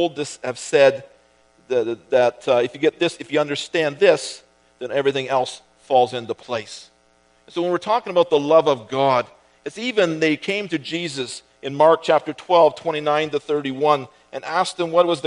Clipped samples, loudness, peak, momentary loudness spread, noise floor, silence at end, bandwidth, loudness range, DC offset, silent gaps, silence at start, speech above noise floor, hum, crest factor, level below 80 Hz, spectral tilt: under 0.1%; -20 LUFS; 0 dBFS; 15 LU; -58 dBFS; 0 s; 10.5 kHz; 3 LU; under 0.1%; none; 0 s; 39 dB; none; 20 dB; -70 dBFS; -4.5 dB/octave